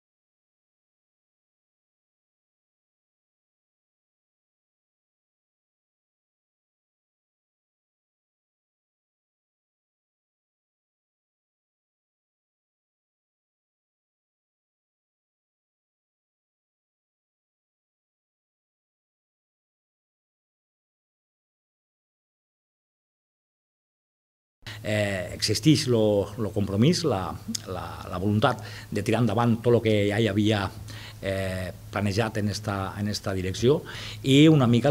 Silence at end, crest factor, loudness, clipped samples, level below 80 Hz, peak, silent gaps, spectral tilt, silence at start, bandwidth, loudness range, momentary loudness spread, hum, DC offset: 0 s; 24 dB; -25 LUFS; under 0.1%; -58 dBFS; -6 dBFS; none; -6 dB/octave; 24.65 s; 16 kHz; 4 LU; 13 LU; none; under 0.1%